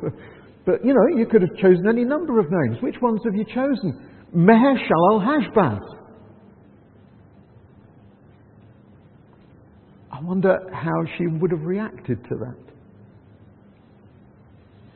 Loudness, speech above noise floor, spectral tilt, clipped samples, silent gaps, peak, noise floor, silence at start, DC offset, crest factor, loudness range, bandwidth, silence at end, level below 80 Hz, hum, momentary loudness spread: -20 LUFS; 31 dB; -12.5 dB/octave; under 0.1%; none; -2 dBFS; -51 dBFS; 0 s; under 0.1%; 20 dB; 11 LU; 4.4 kHz; 2.4 s; -58 dBFS; none; 15 LU